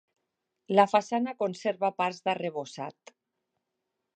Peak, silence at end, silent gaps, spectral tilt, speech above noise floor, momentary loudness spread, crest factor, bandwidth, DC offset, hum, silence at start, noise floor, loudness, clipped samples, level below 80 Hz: -8 dBFS; 1.25 s; none; -5.5 dB/octave; 56 dB; 15 LU; 22 dB; 9.4 kHz; under 0.1%; none; 0.7 s; -84 dBFS; -28 LUFS; under 0.1%; -86 dBFS